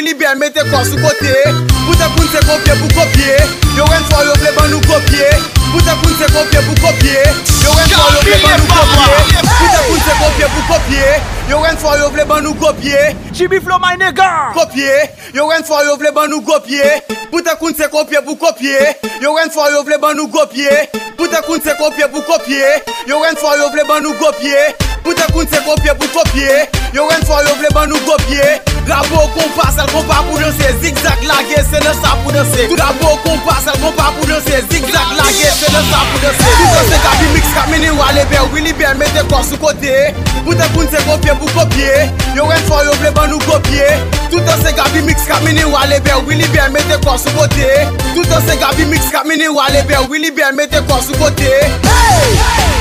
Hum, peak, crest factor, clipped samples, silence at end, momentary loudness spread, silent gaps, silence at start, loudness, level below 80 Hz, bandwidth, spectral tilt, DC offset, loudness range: none; 0 dBFS; 10 dB; 0.3%; 0 s; 5 LU; none; 0 s; -10 LUFS; -18 dBFS; 16.5 kHz; -4 dB/octave; under 0.1%; 4 LU